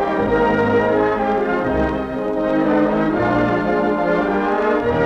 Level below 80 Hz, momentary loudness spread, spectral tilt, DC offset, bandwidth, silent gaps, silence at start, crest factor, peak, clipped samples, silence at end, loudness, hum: -38 dBFS; 3 LU; -8 dB/octave; under 0.1%; 8 kHz; none; 0 s; 12 dB; -6 dBFS; under 0.1%; 0 s; -18 LUFS; none